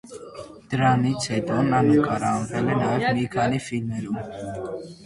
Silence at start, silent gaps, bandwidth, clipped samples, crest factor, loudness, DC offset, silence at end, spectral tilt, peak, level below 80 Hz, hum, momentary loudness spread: 0.05 s; none; 11.5 kHz; under 0.1%; 16 dB; -23 LUFS; under 0.1%; 0 s; -6.5 dB/octave; -6 dBFS; -52 dBFS; none; 14 LU